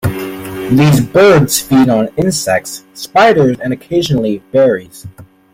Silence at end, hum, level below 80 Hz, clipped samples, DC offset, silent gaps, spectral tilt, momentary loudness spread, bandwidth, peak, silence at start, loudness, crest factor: 0.3 s; none; -42 dBFS; under 0.1%; under 0.1%; none; -5.5 dB/octave; 13 LU; 16.5 kHz; 0 dBFS; 0.05 s; -11 LUFS; 12 dB